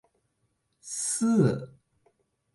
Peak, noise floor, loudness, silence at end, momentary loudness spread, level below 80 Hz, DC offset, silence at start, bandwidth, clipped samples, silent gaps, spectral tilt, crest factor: -12 dBFS; -75 dBFS; -27 LUFS; 0.85 s; 14 LU; -66 dBFS; under 0.1%; 0.85 s; 11.5 kHz; under 0.1%; none; -5.5 dB/octave; 18 dB